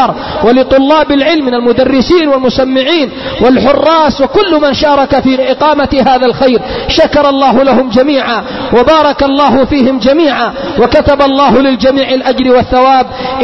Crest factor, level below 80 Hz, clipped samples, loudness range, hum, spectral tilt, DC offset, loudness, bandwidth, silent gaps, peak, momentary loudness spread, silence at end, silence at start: 8 dB; -30 dBFS; 0.3%; 1 LU; none; -6 dB/octave; 1%; -8 LUFS; 6.2 kHz; none; 0 dBFS; 4 LU; 0 s; 0 s